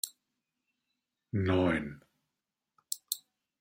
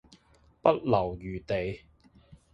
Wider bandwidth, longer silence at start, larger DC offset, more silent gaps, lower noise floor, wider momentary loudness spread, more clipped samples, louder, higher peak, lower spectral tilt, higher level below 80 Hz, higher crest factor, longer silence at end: first, 16 kHz vs 7.8 kHz; second, 0.05 s vs 0.65 s; neither; neither; first, -88 dBFS vs -62 dBFS; about the same, 12 LU vs 13 LU; neither; second, -33 LUFS vs -29 LUFS; second, -14 dBFS vs -6 dBFS; second, -5 dB/octave vs -8 dB/octave; second, -64 dBFS vs -52 dBFS; about the same, 22 dB vs 24 dB; first, 0.4 s vs 0.2 s